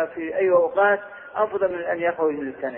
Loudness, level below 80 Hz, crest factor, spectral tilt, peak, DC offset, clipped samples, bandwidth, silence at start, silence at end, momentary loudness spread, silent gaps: -22 LUFS; -64 dBFS; 16 dB; -9.5 dB/octave; -8 dBFS; under 0.1%; under 0.1%; 3.6 kHz; 0 s; 0 s; 7 LU; none